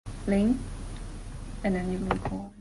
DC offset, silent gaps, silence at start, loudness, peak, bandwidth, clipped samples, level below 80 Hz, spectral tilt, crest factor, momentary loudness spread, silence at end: under 0.1%; none; 0.05 s; -29 LUFS; -10 dBFS; 11.5 kHz; under 0.1%; -40 dBFS; -7 dB/octave; 20 dB; 16 LU; 0 s